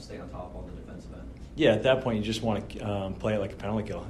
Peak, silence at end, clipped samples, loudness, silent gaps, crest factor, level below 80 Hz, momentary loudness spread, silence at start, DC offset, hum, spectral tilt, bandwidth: -10 dBFS; 0 s; under 0.1%; -28 LUFS; none; 20 dB; -46 dBFS; 19 LU; 0 s; under 0.1%; none; -6 dB/octave; 13 kHz